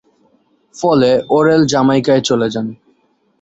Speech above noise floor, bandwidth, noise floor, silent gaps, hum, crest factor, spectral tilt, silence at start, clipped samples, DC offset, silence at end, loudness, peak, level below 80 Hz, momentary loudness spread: 46 dB; 8.2 kHz; -58 dBFS; none; none; 14 dB; -5.5 dB/octave; 0.75 s; under 0.1%; under 0.1%; 0.7 s; -13 LUFS; -2 dBFS; -52 dBFS; 8 LU